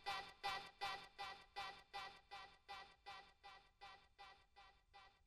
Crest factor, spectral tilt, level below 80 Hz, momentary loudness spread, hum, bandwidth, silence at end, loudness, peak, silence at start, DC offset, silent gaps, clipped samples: 22 dB; -1.5 dB/octave; -78 dBFS; 19 LU; none; 13 kHz; 0.1 s; -53 LUFS; -32 dBFS; 0 s; under 0.1%; none; under 0.1%